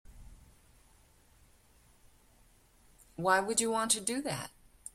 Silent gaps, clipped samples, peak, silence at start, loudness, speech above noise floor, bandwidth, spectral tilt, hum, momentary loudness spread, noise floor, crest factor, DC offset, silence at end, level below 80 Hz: none; under 0.1%; -12 dBFS; 0.1 s; -31 LUFS; 33 dB; 16.5 kHz; -2 dB/octave; none; 20 LU; -64 dBFS; 24 dB; under 0.1%; 0.45 s; -62 dBFS